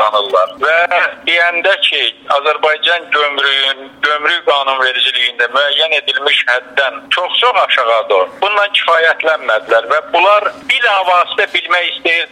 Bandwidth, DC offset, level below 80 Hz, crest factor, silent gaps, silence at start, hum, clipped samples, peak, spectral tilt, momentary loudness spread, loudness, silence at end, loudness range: 12 kHz; under 0.1%; -64 dBFS; 12 dB; none; 0 s; none; under 0.1%; 0 dBFS; -0.5 dB/octave; 4 LU; -12 LUFS; 0.05 s; 1 LU